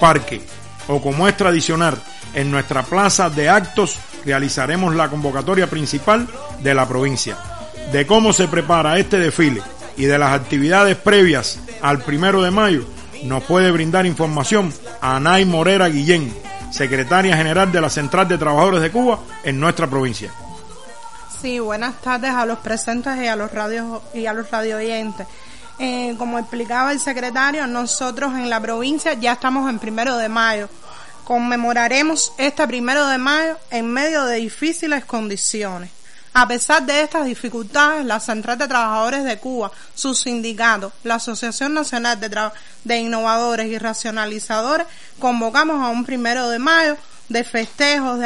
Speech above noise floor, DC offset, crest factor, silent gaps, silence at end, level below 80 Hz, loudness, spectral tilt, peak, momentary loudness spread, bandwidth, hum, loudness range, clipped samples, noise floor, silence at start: 20 dB; 2%; 18 dB; none; 0 s; -46 dBFS; -17 LUFS; -4 dB/octave; 0 dBFS; 11 LU; 11.5 kHz; none; 6 LU; under 0.1%; -38 dBFS; 0 s